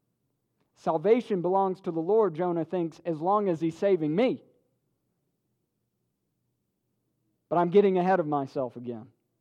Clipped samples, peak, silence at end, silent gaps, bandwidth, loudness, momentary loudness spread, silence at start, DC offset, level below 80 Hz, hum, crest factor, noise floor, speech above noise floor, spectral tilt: under 0.1%; -10 dBFS; 0.35 s; none; 8.4 kHz; -27 LUFS; 11 LU; 0.85 s; under 0.1%; -80 dBFS; none; 18 dB; -79 dBFS; 53 dB; -8.5 dB/octave